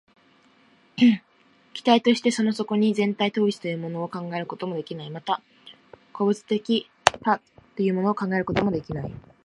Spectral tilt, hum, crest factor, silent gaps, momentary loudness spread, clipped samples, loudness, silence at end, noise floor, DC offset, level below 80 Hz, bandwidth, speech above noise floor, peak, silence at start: -5.5 dB/octave; none; 24 dB; none; 13 LU; under 0.1%; -24 LUFS; 0.25 s; -59 dBFS; under 0.1%; -56 dBFS; 11.5 kHz; 36 dB; 0 dBFS; 0.95 s